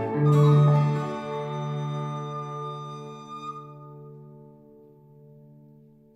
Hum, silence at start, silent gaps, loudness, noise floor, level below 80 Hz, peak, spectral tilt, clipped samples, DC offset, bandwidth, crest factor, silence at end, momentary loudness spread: 50 Hz at -75 dBFS; 0 s; none; -25 LUFS; -53 dBFS; -72 dBFS; -10 dBFS; -9 dB/octave; under 0.1%; under 0.1%; 7.8 kHz; 16 dB; 1.65 s; 26 LU